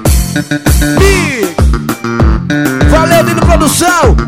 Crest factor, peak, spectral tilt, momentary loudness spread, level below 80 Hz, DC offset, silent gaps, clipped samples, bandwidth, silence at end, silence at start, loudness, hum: 8 dB; 0 dBFS; -5 dB/octave; 5 LU; -14 dBFS; under 0.1%; none; 0.8%; 16.5 kHz; 0 s; 0 s; -9 LUFS; none